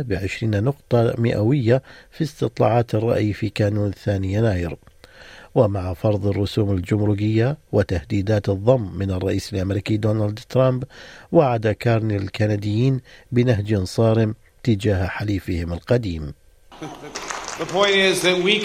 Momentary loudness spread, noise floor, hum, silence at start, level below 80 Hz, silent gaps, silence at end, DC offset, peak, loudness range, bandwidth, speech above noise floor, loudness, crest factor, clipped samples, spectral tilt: 10 LU; -44 dBFS; none; 0 s; -46 dBFS; none; 0 s; under 0.1%; -2 dBFS; 2 LU; 14 kHz; 24 dB; -21 LUFS; 18 dB; under 0.1%; -6.5 dB/octave